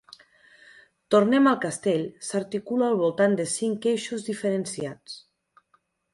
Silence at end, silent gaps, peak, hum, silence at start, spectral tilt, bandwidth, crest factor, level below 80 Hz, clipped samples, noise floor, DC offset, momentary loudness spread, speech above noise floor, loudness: 0.95 s; none; -8 dBFS; none; 1.1 s; -5 dB/octave; 11.5 kHz; 18 dB; -70 dBFS; under 0.1%; -68 dBFS; under 0.1%; 13 LU; 44 dB; -25 LUFS